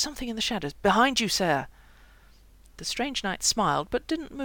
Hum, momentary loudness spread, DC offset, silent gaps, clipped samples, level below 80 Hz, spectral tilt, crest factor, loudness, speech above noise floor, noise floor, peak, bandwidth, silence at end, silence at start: none; 10 LU; under 0.1%; none; under 0.1%; -50 dBFS; -2.5 dB/octave; 20 dB; -26 LUFS; 27 dB; -54 dBFS; -8 dBFS; 18 kHz; 0 s; 0 s